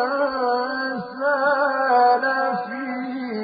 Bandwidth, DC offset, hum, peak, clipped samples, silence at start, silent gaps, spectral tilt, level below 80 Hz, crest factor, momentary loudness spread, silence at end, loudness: 5 kHz; under 0.1%; none; -8 dBFS; under 0.1%; 0 s; none; -9 dB/octave; -68 dBFS; 14 dB; 11 LU; 0 s; -21 LUFS